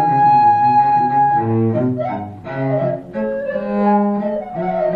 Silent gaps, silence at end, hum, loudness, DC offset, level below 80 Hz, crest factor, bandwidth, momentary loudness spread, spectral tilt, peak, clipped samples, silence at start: none; 0 s; none; -16 LUFS; under 0.1%; -52 dBFS; 12 dB; 5 kHz; 11 LU; -10 dB/octave; -4 dBFS; under 0.1%; 0 s